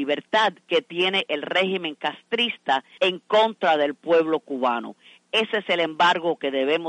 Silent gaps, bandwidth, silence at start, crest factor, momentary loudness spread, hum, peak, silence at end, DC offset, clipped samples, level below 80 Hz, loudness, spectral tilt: none; 9.6 kHz; 0 s; 16 dB; 6 LU; none; -8 dBFS; 0 s; under 0.1%; under 0.1%; -78 dBFS; -23 LUFS; -4 dB/octave